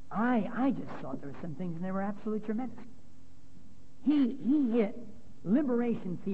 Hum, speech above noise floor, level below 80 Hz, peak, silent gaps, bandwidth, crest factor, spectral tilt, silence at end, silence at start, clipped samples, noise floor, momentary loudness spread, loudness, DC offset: none; 27 dB; -64 dBFS; -18 dBFS; none; 8 kHz; 16 dB; -9 dB/octave; 0 s; 0.1 s; under 0.1%; -58 dBFS; 14 LU; -32 LUFS; 1%